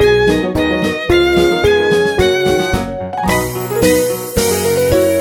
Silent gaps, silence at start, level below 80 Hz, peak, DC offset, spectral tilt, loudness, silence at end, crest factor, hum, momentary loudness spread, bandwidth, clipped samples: none; 0 s; -30 dBFS; 0 dBFS; under 0.1%; -4.5 dB/octave; -13 LUFS; 0 s; 12 dB; none; 5 LU; 17 kHz; under 0.1%